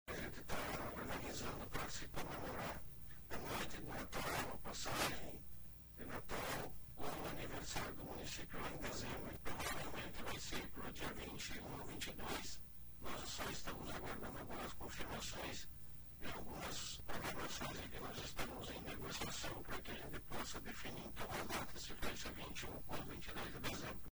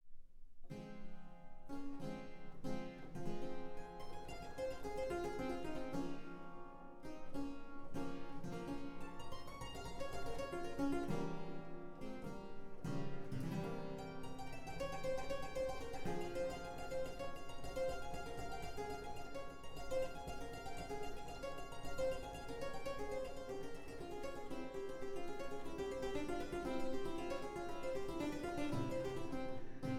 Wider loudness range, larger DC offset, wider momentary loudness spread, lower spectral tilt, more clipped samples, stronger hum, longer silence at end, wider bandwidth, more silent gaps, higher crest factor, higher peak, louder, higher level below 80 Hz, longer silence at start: second, 2 LU vs 5 LU; neither; second, 6 LU vs 9 LU; second, -3.5 dB/octave vs -6 dB/octave; neither; neither; about the same, 0.05 s vs 0 s; first, over 20 kHz vs 14 kHz; neither; first, 20 dB vs 14 dB; first, -24 dBFS vs -28 dBFS; about the same, -47 LUFS vs -47 LUFS; about the same, -58 dBFS vs -54 dBFS; about the same, 0.05 s vs 0.05 s